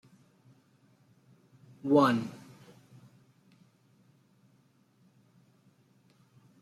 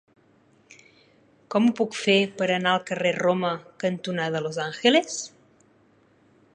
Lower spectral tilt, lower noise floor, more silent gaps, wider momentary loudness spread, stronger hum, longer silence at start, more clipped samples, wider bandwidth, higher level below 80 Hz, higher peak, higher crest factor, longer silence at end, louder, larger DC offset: first, -7 dB/octave vs -4.5 dB/octave; first, -67 dBFS vs -60 dBFS; neither; first, 30 LU vs 9 LU; neither; first, 1.85 s vs 1.5 s; neither; first, 13.5 kHz vs 10.5 kHz; second, -80 dBFS vs -74 dBFS; second, -12 dBFS vs -4 dBFS; about the same, 24 dB vs 22 dB; first, 4.25 s vs 1.25 s; second, -28 LUFS vs -24 LUFS; neither